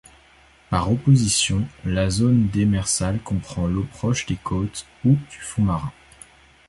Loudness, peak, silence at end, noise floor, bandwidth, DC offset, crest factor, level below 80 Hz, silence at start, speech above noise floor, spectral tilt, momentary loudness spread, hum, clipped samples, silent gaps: -22 LUFS; -6 dBFS; 0.8 s; -53 dBFS; 11.5 kHz; under 0.1%; 16 dB; -38 dBFS; 0.7 s; 32 dB; -5 dB/octave; 9 LU; none; under 0.1%; none